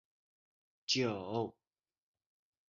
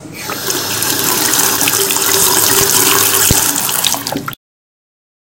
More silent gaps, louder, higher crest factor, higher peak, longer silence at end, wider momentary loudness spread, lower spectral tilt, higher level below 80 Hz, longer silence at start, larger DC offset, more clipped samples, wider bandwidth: neither; second, -36 LUFS vs -10 LUFS; first, 22 dB vs 14 dB; second, -18 dBFS vs 0 dBFS; first, 1.2 s vs 1 s; about the same, 11 LU vs 11 LU; first, -3.5 dB/octave vs -1 dB/octave; second, -76 dBFS vs -38 dBFS; first, 0.9 s vs 0 s; second, under 0.1% vs 0.2%; second, under 0.1% vs 0.2%; second, 7.2 kHz vs over 20 kHz